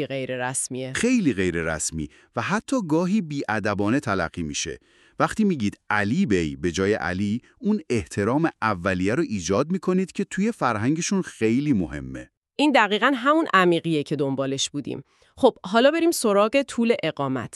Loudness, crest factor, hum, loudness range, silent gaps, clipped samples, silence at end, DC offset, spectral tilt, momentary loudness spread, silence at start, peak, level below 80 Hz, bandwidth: -23 LUFS; 20 dB; none; 3 LU; 12.37-12.42 s; under 0.1%; 0.1 s; under 0.1%; -5 dB/octave; 9 LU; 0 s; -4 dBFS; -52 dBFS; 13.5 kHz